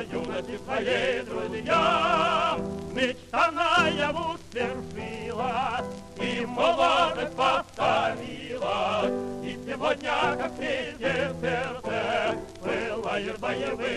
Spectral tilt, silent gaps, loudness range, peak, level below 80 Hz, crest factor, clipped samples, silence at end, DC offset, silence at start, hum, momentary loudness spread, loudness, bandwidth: -4.5 dB/octave; none; 4 LU; -10 dBFS; -54 dBFS; 16 dB; under 0.1%; 0 s; under 0.1%; 0 s; none; 11 LU; -27 LUFS; 12.5 kHz